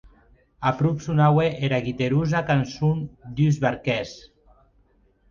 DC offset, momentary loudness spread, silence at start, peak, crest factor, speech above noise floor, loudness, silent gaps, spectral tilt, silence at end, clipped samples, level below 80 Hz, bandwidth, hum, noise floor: under 0.1%; 8 LU; 0.05 s; -6 dBFS; 18 dB; 39 dB; -23 LUFS; none; -7.5 dB/octave; 1.1 s; under 0.1%; -50 dBFS; 7.2 kHz; none; -61 dBFS